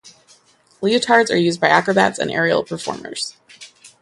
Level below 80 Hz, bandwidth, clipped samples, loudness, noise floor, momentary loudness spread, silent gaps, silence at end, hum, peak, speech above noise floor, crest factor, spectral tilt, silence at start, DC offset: -60 dBFS; 11.5 kHz; under 0.1%; -18 LUFS; -53 dBFS; 12 LU; none; 0.15 s; none; 0 dBFS; 36 dB; 20 dB; -4 dB/octave; 0.05 s; under 0.1%